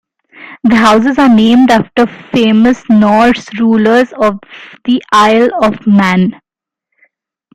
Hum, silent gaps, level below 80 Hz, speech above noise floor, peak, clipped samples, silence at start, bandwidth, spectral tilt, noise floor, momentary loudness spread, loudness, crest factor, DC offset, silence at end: none; none; -44 dBFS; 65 dB; 0 dBFS; under 0.1%; 0.4 s; 11 kHz; -6 dB/octave; -73 dBFS; 7 LU; -9 LUFS; 10 dB; under 0.1%; 1.25 s